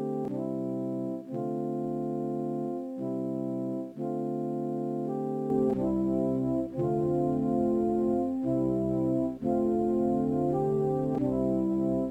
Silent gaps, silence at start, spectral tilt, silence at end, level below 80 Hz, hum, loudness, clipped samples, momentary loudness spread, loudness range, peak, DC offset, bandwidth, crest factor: none; 0 s; -10.5 dB/octave; 0 s; -56 dBFS; none; -30 LUFS; under 0.1%; 6 LU; 5 LU; -16 dBFS; under 0.1%; 8.8 kHz; 12 dB